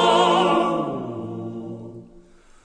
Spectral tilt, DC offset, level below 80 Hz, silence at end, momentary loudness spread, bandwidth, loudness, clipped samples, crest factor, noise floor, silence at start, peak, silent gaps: -5 dB/octave; under 0.1%; -58 dBFS; 0.45 s; 19 LU; 10 kHz; -21 LUFS; under 0.1%; 16 dB; -49 dBFS; 0 s; -6 dBFS; none